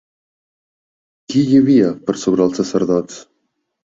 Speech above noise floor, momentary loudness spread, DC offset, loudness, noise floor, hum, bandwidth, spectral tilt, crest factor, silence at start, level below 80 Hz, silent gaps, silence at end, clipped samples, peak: 56 dB; 9 LU; under 0.1%; -15 LUFS; -71 dBFS; none; 7.8 kHz; -6.5 dB/octave; 16 dB; 1.3 s; -56 dBFS; none; 0.75 s; under 0.1%; -2 dBFS